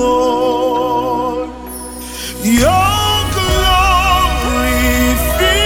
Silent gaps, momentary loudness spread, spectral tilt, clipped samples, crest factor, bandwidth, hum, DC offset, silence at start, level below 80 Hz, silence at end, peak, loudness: none; 13 LU; -4 dB/octave; under 0.1%; 12 dB; 18 kHz; none; under 0.1%; 0 s; -22 dBFS; 0 s; 0 dBFS; -13 LUFS